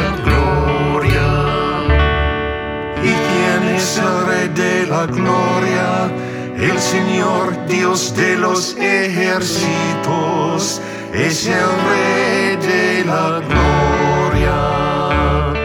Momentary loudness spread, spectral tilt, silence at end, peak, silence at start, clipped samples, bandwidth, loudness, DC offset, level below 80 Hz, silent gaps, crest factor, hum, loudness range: 4 LU; -5 dB/octave; 0 s; -2 dBFS; 0 s; under 0.1%; 18 kHz; -15 LUFS; under 0.1%; -26 dBFS; none; 14 dB; none; 2 LU